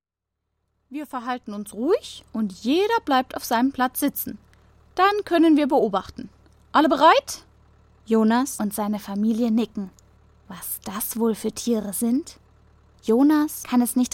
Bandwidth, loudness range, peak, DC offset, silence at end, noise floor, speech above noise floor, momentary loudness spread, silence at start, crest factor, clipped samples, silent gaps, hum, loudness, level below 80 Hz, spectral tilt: 17 kHz; 6 LU; -4 dBFS; under 0.1%; 0.05 s; -82 dBFS; 61 dB; 16 LU; 0.9 s; 18 dB; under 0.1%; none; none; -22 LUFS; -56 dBFS; -4.5 dB/octave